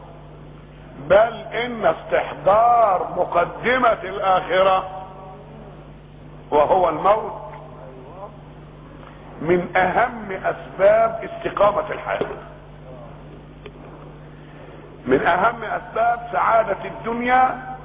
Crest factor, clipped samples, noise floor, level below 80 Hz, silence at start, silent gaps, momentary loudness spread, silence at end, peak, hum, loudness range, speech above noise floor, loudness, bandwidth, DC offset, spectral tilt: 18 dB; under 0.1%; -41 dBFS; -46 dBFS; 0 s; none; 24 LU; 0 s; -4 dBFS; 50 Hz at -45 dBFS; 7 LU; 22 dB; -19 LUFS; 4 kHz; under 0.1%; -9 dB/octave